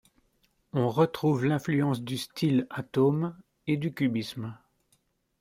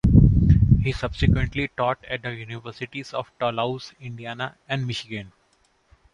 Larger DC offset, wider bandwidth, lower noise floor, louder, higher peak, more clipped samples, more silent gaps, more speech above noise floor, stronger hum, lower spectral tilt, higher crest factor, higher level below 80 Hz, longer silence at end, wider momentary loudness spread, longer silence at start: neither; first, 16 kHz vs 9.4 kHz; first, -71 dBFS vs -64 dBFS; second, -28 LUFS vs -23 LUFS; second, -10 dBFS vs -4 dBFS; neither; neither; first, 44 dB vs 37 dB; neither; about the same, -7 dB/octave vs -7.5 dB/octave; about the same, 18 dB vs 20 dB; second, -66 dBFS vs -30 dBFS; about the same, 0.85 s vs 0.85 s; second, 10 LU vs 17 LU; first, 0.75 s vs 0.05 s